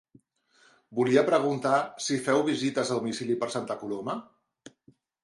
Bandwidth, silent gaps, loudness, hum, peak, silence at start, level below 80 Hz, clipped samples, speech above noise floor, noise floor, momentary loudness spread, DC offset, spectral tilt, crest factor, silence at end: 11.5 kHz; none; -28 LUFS; none; -8 dBFS; 0.9 s; -74 dBFS; under 0.1%; 38 dB; -64 dBFS; 11 LU; under 0.1%; -4.5 dB/octave; 20 dB; 1 s